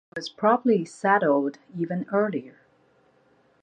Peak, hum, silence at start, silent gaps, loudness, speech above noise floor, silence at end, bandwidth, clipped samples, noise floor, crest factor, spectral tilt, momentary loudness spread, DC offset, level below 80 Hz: -6 dBFS; none; 0.15 s; none; -24 LUFS; 38 dB; 1.1 s; 9.8 kHz; under 0.1%; -62 dBFS; 20 dB; -6.5 dB/octave; 12 LU; under 0.1%; -76 dBFS